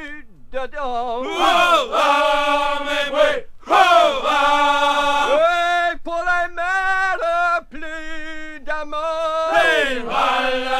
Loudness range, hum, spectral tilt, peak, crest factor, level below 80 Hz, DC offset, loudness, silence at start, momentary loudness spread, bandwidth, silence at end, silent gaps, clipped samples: 5 LU; none; -2 dB/octave; 0 dBFS; 18 dB; -40 dBFS; under 0.1%; -17 LUFS; 0 s; 15 LU; 16 kHz; 0 s; none; under 0.1%